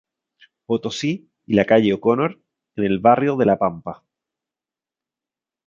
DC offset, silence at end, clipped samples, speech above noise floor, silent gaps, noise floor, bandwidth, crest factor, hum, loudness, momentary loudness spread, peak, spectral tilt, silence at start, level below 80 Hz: under 0.1%; 1.75 s; under 0.1%; 72 dB; none; -90 dBFS; 7.6 kHz; 20 dB; none; -19 LUFS; 13 LU; -2 dBFS; -6.5 dB/octave; 0.7 s; -56 dBFS